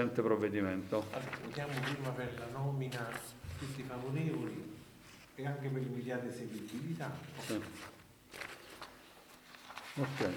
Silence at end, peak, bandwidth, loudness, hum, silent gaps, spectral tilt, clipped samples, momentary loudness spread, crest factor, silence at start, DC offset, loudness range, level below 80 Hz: 0 s; -18 dBFS; over 20 kHz; -40 LUFS; none; none; -6 dB/octave; under 0.1%; 17 LU; 22 dB; 0 s; under 0.1%; 7 LU; -66 dBFS